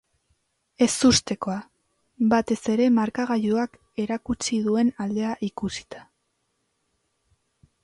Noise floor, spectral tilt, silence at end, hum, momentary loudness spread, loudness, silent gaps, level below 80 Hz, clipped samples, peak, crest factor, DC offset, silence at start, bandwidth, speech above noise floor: -74 dBFS; -4 dB/octave; 1.8 s; none; 12 LU; -24 LUFS; none; -54 dBFS; under 0.1%; -8 dBFS; 18 dB; under 0.1%; 0.8 s; 11.5 kHz; 51 dB